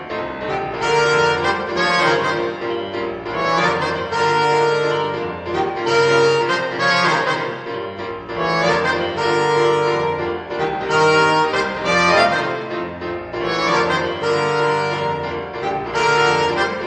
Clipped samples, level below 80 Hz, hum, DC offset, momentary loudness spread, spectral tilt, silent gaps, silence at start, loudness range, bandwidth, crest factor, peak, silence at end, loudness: under 0.1%; -50 dBFS; none; under 0.1%; 10 LU; -4.5 dB/octave; none; 0 s; 2 LU; 9.6 kHz; 16 dB; -2 dBFS; 0 s; -18 LUFS